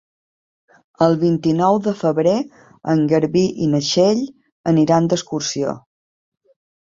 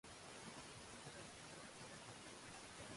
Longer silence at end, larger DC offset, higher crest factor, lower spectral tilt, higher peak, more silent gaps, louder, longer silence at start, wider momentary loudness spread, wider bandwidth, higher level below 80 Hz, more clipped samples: first, 1.15 s vs 0 s; neither; about the same, 16 dB vs 14 dB; first, -6 dB/octave vs -3 dB/octave; first, -2 dBFS vs -42 dBFS; first, 4.52-4.64 s vs none; first, -18 LUFS vs -55 LUFS; first, 1 s vs 0.05 s; first, 10 LU vs 1 LU; second, 7.8 kHz vs 11.5 kHz; first, -58 dBFS vs -74 dBFS; neither